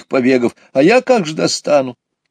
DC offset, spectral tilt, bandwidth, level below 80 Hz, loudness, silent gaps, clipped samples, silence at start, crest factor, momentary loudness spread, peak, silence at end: under 0.1%; -4.5 dB/octave; 10 kHz; -64 dBFS; -14 LUFS; none; under 0.1%; 0.1 s; 14 dB; 6 LU; 0 dBFS; 0.4 s